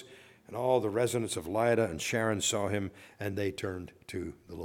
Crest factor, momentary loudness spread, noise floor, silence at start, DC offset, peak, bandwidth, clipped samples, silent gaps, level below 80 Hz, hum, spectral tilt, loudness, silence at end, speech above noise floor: 18 dB; 14 LU; -54 dBFS; 0 s; under 0.1%; -14 dBFS; 19 kHz; under 0.1%; none; -62 dBFS; none; -4 dB/octave; -32 LUFS; 0 s; 23 dB